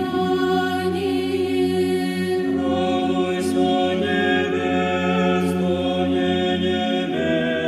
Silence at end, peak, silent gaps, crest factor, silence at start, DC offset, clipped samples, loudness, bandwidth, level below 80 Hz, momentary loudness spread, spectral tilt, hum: 0 s; -8 dBFS; none; 12 dB; 0 s; under 0.1%; under 0.1%; -21 LUFS; 14.5 kHz; -60 dBFS; 3 LU; -6 dB/octave; none